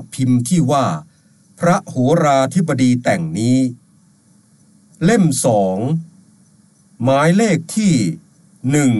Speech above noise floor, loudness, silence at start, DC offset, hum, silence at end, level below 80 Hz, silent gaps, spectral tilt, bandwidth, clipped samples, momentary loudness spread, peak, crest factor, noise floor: 37 dB; -16 LUFS; 0 s; under 0.1%; none; 0 s; -54 dBFS; none; -6 dB/octave; 12.5 kHz; under 0.1%; 8 LU; -4 dBFS; 14 dB; -52 dBFS